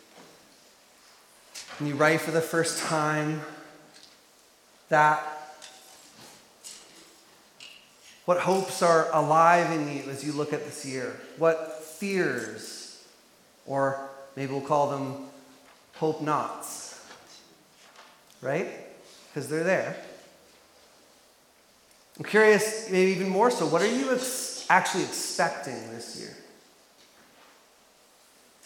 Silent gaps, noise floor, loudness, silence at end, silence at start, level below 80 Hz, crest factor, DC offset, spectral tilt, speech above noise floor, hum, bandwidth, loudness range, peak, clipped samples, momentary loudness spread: none; -60 dBFS; -26 LUFS; 2.25 s; 0.15 s; -80 dBFS; 24 dB; under 0.1%; -4 dB/octave; 34 dB; none; 17.5 kHz; 10 LU; -6 dBFS; under 0.1%; 23 LU